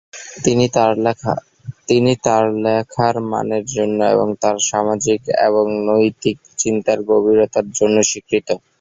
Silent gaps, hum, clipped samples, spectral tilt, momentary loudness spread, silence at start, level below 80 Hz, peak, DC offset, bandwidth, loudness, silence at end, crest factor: none; none; under 0.1%; -4.5 dB/octave; 7 LU; 0.15 s; -54 dBFS; 0 dBFS; under 0.1%; 8 kHz; -17 LUFS; 0.25 s; 16 dB